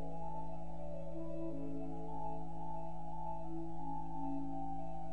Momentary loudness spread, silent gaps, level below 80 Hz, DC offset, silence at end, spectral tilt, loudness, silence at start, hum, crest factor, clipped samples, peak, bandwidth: 4 LU; none; -56 dBFS; 1%; 0 s; -9.5 dB/octave; -46 LUFS; 0 s; none; 12 dB; under 0.1%; -28 dBFS; 9.6 kHz